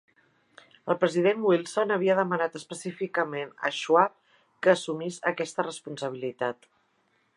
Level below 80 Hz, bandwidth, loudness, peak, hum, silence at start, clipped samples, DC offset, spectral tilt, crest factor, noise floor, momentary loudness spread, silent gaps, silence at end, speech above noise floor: -82 dBFS; 11.5 kHz; -27 LUFS; -6 dBFS; none; 0.85 s; under 0.1%; under 0.1%; -5 dB/octave; 22 dB; -70 dBFS; 11 LU; none; 0.85 s; 43 dB